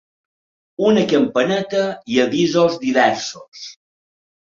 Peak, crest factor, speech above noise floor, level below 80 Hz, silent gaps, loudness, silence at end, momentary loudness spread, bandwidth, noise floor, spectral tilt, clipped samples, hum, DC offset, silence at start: -2 dBFS; 16 dB; over 73 dB; -60 dBFS; 3.48-3.52 s; -17 LUFS; 0.8 s; 19 LU; 7.6 kHz; under -90 dBFS; -5 dB/octave; under 0.1%; none; under 0.1%; 0.8 s